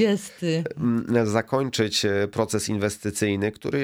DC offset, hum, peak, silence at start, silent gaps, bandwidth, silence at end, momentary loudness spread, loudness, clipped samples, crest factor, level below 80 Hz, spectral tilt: under 0.1%; none; -8 dBFS; 0 s; none; 16.5 kHz; 0 s; 4 LU; -24 LUFS; under 0.1%; 16 dB; -58 dBFS; -5 dB/octave